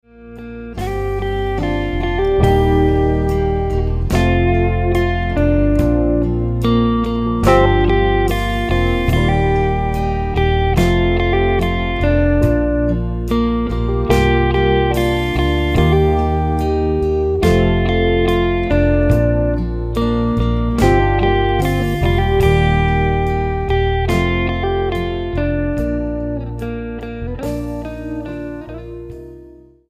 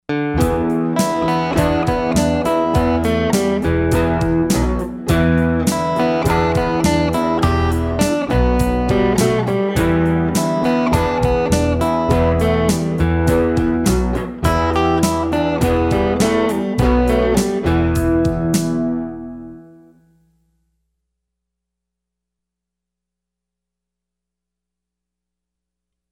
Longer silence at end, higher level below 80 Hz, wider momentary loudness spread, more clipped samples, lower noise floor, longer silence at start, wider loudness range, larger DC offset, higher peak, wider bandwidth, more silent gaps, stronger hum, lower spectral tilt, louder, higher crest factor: second, 0.4 s vs 6.45 s; first, -22 dBFS vs -28 dBFS; first, 11 LU vs 3 LU; neither; second, -41 dBFS vs -83 dBFS; about the same, 0.2 s vs 0.1 s; about the same, 5 LU vs 3 LU; neither; first, 0 dBFS vs -4 dBFS; about the same, 15.5 kHz vs 17 kHz; neither; second, none vs 60 Hz at -40 dBFS; first, -7.5 dB/octave vs -6 dB/octave; about the same, -16 LUFS vs -17 LUFS; about the same, 16 dB vs 14 dB